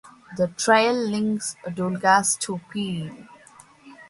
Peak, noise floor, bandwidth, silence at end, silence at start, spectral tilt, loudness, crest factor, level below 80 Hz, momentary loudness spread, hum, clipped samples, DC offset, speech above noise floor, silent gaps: -4 dBFS; -51 dBFS; 11.5 kHz; 0.05 s; 0.05 s; -3.5 dB/octave; -23 LUFS; 20 dB; -64 dBFS; 12 LU; none; under 0.1%; under 0.1%; 28 dB; none